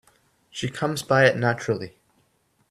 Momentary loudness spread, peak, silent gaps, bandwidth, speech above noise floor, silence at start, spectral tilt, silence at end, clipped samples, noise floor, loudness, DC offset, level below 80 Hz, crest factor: 16 LU; -4 dBFS; none; 14 kHz; 44 dB; 0.55 s; -5 dB/octave; 0.8 s; under 0.1%; -67 dBFS; -23 LUFS; under 0.1%; -62 dBFS; 22 dB